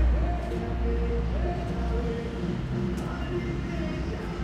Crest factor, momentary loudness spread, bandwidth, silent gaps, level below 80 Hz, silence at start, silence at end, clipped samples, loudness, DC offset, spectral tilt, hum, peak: 14 dB; 3 LU; 8.4 kHz; none; -30 dBFS; 0 s; 0 s; under 0.1%; -30 LUFS; under 0.1%; -8 dB/octave; none; -14 dBFS